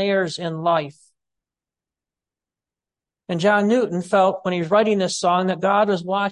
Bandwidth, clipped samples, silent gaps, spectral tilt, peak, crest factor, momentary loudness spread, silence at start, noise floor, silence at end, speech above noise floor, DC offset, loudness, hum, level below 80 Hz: 11.5 kHz; under 0.1%; none; -5 dB/octave; -6 dBFS; 16 dB; 6 LU; 0 s; -89 dBFS; 0 s; 70 dB; under 0.1%; -20 LUFS; none; -70 dBFS